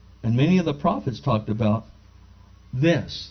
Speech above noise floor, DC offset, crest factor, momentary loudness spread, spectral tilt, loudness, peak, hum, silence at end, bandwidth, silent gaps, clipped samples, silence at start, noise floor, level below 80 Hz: 27 dB; under 0.1%; 16 dB; 7 LU; -7.5 dB/octave; -23 LUFS; -8 dBFS; 60 Hz at -45 dBFS; 0 s; 6.4 kHz; none; under 0.1%; 0.25 s; -49 dBFS; -48 dBFS